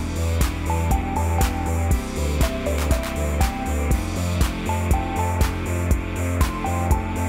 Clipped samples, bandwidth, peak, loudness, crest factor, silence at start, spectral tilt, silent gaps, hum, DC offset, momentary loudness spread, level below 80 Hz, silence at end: under 0.1%; 16.5 kHz; -6 dBFS; -23 LUFS; 14 dB; 0 s; -5.5 dB/octave; none; none; under 0.1%; 2 LU; -26 dBFS; 0 s